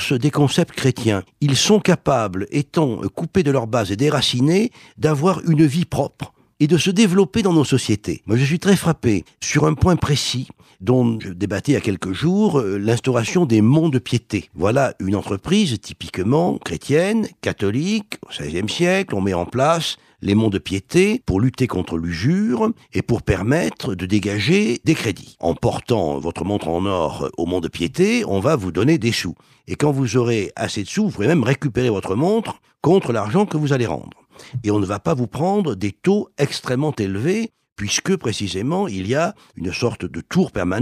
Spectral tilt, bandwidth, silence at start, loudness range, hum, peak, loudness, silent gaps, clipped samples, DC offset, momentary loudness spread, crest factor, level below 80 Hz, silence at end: -5.5 dB/octave; 15 kHz; 0 s; 3 LU; none; -4 dBFS; -19 LUFS; 37.72-37.76 s; under 0.1%; under 0.1%; 8 LU; 16 dB; -44 dBFS; 0 s